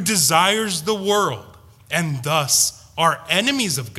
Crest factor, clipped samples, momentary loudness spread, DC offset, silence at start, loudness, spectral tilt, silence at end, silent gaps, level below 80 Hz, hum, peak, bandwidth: 20 dB; under 0.1%; 8 LU; under 0.1%; 0 s; -18 LUFS; -2.5 dB/octave; 0 s; none; -56 dBFS; none; 0 dBFS; 16 kHz